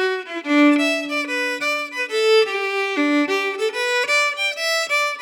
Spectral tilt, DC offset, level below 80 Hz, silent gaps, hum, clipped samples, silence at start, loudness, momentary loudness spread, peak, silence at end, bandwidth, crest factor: -0.5 dB/octave; under 0.1%; under -90 dBFS; none; none; under 0.1%; 0 s; -19 LUFS; 6 LU; -6 dBFS; 0 s; 18 kHz; 14 dB